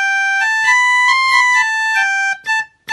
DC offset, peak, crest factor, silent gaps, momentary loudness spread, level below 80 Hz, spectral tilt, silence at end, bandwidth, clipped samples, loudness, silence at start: under 0.1%; 0 dBFS; 14 dB; none; 7 LU; -68 dBFS; 3.5 dB/octave; 0 s; 12.5 kHz; under 0.1%; -12 LUFS; 0 s